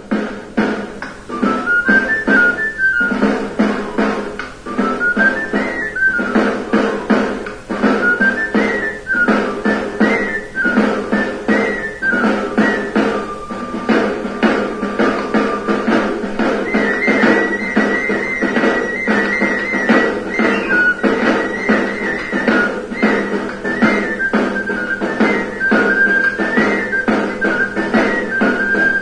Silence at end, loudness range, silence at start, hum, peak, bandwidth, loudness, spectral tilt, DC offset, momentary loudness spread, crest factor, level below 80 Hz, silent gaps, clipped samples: 0 s; 2 LU; 0 s; none; 0 dBFS; 10.5 kHz; -15 LUFS; -5.5 dB/octave; under 0.1%; 7 LU; 16 dB; -42 dBFS; none; under 0.1%